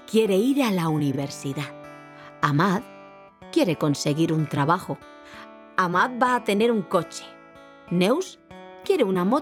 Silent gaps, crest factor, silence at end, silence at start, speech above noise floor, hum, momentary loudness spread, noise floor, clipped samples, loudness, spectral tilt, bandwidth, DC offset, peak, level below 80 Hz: none; 20 dB; 0 s; 0.1 s; 25 dB; none; 22 LU; -48 dBFS; under 0.1%; -23 LUFS; -6 dB/octave; 17 kHz; under 0.1%; -4 dBFS; -66 dBFS